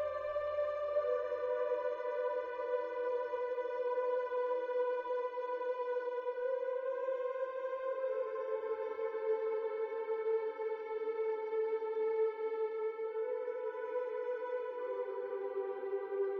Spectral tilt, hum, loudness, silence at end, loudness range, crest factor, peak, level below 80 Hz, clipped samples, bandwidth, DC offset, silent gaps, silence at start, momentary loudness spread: -5.5 dB/octave; none; -38 LUFS; 0 s; 1 LU; 12 dB; -24 dBFS; -80 dBFS; under 0.1%; 5.6 kHz; under 0.1%; none; 0 s; 4 LU